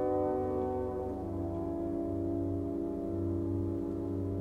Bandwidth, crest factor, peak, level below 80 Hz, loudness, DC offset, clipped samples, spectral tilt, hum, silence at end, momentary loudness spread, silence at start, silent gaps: 5.4 kHz; 14 dB; -20 dBFS; -52 dBFS; -35 LUFS; under 0.1%; under 0.1%; -10.5 dB/octave; none; 0 s; 4 LU; 0 s; none